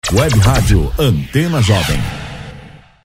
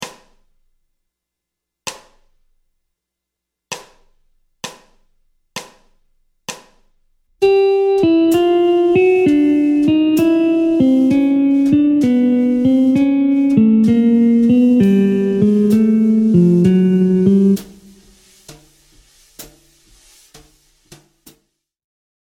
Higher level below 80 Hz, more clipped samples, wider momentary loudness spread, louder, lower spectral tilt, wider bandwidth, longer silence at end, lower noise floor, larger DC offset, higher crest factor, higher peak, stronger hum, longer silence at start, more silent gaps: first, -22 dBFS vs -52 dBFS; neither; about the same, 17 LU vs 19 LU; about the same, -14 LUFS vs -13 LUFS; second, -5.5 dB/octave vs -7.5 dB/octave; about the same, 16.5 kHz vs 16.5 kHz; second, 0.3 s vs 2.75 s; second, -37 dBFS vs -81 dBFS; neither; about the same, 14 dB vs 14 dB; about the same, 0 dBFS vs 0 dBFS; neither; about the same, 0.05 s vs 0 s; neither